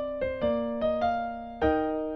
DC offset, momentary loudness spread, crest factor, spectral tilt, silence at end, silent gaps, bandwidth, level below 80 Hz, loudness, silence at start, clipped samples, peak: under 0.1%; 5 LU; 18 dB; -8 dB/octave; 0 s; none; 6.2 kHz; -48 dBFS; -29 LUFS; 0 s; under 0.1%; -12 dBFS